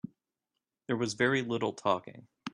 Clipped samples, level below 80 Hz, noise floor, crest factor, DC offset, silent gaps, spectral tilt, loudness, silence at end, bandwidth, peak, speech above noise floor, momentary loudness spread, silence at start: under 0.1%; -72 dBFS; -88 dBFS; 20 dB; under 0.1%; none; -5 dB/octave; -31 LUFS; 0.05 s; 11 kHz; -14 dBFS; 57 dB; 20 LU; 0.9 s